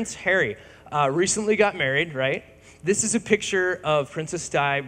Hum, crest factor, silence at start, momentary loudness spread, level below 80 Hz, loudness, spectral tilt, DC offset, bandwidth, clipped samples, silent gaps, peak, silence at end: none; 22 dB; 0 s; 9 LU; -56 dBFS; -23 LUFS; -3.5 dB/octave; under 0.1%; 15.5 kHz; under 0.1%; none; -2 dBFS; 0 s